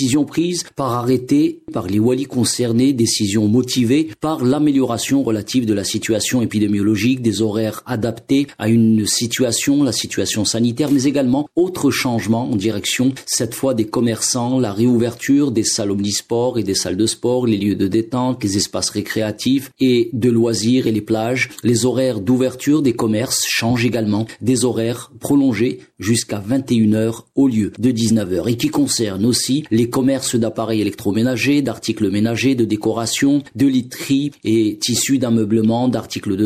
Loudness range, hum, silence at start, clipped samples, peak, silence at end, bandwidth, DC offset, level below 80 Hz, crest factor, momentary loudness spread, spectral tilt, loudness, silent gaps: 2 LU; none; 0 s; under 0.1%; -4 dBFS; 0 s; 15.5 kHz; under 0.1%; -54 dBFS; 12 dB; 4 LU; -4.5 dB/octave; -17 LUFS; none